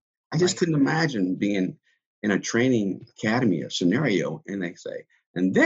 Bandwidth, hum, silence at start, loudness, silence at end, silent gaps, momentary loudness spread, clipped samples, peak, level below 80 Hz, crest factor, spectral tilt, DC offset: 8.2 kHz; none; 0.3 s; -25 LUFS; 0 s; 2.06-2.22 s, 5.26-5.34 s; 10 LU; under 0.1%; -6 dBFS; -66 dBFS; 18 dB; -5.5 dB/octave; under 0.1%